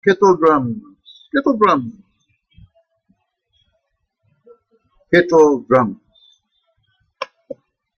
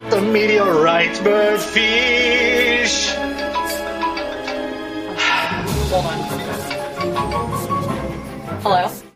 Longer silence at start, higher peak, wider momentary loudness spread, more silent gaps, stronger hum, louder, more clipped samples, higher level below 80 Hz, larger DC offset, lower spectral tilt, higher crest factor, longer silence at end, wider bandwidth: about the same, 0.05 s vs 0 s; about the same, -2 dBFS vs 0 dBFS; first, 22 LU vs 11 LU; neither; neither; first, -15 LUFS vs -18 LUFS; neither; second, -58 dBFS vs -38 dBFS; neither; first, -6.5 dB/octave vs -3.5 dB/octave; about the same, 18 dB vs 18 dB; first, 0.45 s vs 0.1 s; second, 6.8 kHz vs 15.5 kHz